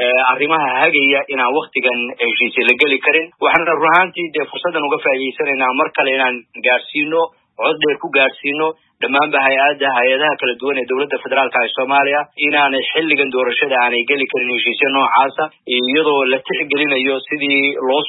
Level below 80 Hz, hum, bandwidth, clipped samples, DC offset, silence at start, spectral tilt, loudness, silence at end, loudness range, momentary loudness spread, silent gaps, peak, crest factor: -70 dBFS; none; 4.1 kHz; under 0.1%; under 0.1%; 0 s; -5.5 dB/octave; -15 LUFS; 0 s; 3 LU; 6 LU; none; 0 dBFS; 16 dB